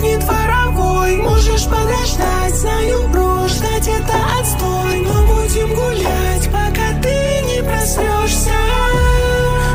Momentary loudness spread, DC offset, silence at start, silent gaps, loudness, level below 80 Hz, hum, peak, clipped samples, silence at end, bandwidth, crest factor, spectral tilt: 3 LU; under 0.1%; 0 s; none; -15 LUFS; -18 dBFS; none; -2 dBFS; under 0.1%; 0 s; 16 kHz; 12 dB; -4.5 dB/octave